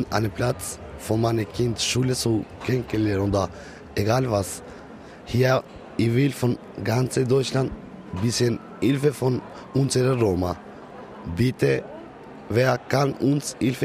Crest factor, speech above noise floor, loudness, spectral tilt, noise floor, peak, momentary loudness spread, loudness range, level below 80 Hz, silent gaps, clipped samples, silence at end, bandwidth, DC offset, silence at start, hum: 18 dB; 19 dB; -24 LUFS; -5.5 dB/octave; -42 dBFS; -6 dBFS; 16 LU; 1 LU; -48 dBFS; none; under 0.1%; 0 s; 15.5 kHz; under 0.1%; 0 s; none